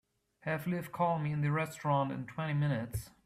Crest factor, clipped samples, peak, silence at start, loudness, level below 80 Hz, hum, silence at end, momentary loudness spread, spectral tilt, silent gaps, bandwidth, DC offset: 16 dB; under 0.1%; -20 dBFS; 0.45 s; -34 LUFS; -60 dBFS; none; 0.15 s; 6 LU; -7 dB/octave; none; 15 kHz; under 0.1%